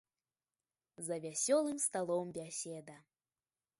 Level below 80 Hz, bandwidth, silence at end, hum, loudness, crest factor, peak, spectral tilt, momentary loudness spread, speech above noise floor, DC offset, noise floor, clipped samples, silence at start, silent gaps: -84 dBFS; 12 kHz; 0.8 s; none; -37 LUFS; 20 dB; -20 dBFS; -3.5 dB/octave; 14 LU; over 52 dB; under 0.1%; under -90 dBFS; under 0.1%; 1 s; none